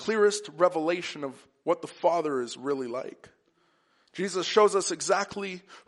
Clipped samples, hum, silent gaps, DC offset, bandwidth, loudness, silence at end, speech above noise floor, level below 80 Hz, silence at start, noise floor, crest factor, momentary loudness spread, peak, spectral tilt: under 0.1%; none; none; under 0.1%; 11.5 kHz; -28 LUFS; 0.1 s; 41 dB; -78 dBFS; 0 s; -69 dBFS; 22 dB; 14 LU; -6 dBFS; -3 dB/octave